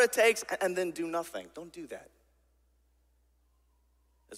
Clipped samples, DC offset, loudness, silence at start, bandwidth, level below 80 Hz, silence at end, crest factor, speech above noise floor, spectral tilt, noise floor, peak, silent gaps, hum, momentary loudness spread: under 0.1%; under 0.1%; -30 LUFS; 0 s; 16 kHz; -70 dBFS; 0 s; 24 dB; 38 dB; -2.5 dB/octave; -70 dBFS; -10 dBFS; none; none; 20 LU